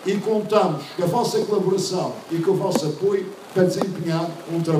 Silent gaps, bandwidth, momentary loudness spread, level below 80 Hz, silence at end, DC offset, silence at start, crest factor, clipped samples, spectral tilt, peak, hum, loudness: none; 15.5 kHz; 6 LU; -68 dBFS; 0 s; under 0.1%; 0 s; 18 dB; under 0.1%; -6 dB/octave; -4 dBFS; none; -22 LUFS